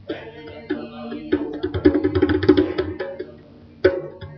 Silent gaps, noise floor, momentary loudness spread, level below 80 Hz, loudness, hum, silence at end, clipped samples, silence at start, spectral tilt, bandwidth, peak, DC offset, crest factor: none; -45 dBFS; 17 LU; -44 dBFS; -21 LUFS; none; 0 s; under 0.1%; 0.05 s; -6 dB/octave; 5.8 kHz; 0 dBFS; under 0.1%; 22 dB